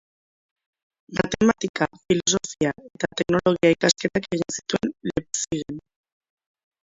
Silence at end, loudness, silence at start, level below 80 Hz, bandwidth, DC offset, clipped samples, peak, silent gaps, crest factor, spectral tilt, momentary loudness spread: 1.05 s; -23 LUFS; 1.1 s; -52 dBFS; 8 kHz; under 0.1%; under 0.1%; -4 dBFS; 1.69-1.74 s; 22 dB; -4 dB/octave; 10 LU